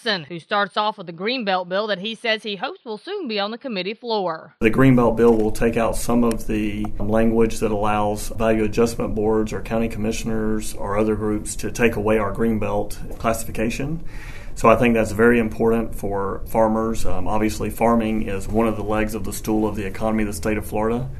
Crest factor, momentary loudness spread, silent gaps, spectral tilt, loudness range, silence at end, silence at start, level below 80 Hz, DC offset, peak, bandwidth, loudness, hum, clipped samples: 20 dB; 10 LU; none; -5.5 dB/octave; 4 LU; 0 s; 0.05 s; -32 dBFS; under 0.1%; 0 dBFS; 13.5 kHz; -21 LUFS; none; under 0.1%